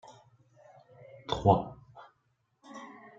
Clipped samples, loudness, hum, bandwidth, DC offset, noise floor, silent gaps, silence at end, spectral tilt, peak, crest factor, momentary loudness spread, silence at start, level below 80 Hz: under 0.1%; -28 LUFS; none; 7.6 kHz; under 0.1%; -75 dBFS; none; 0.3 s; -7.5 dB/octave; -8 dBFS; 26 dB; 26 LU; 1.3 s; -58 dBFS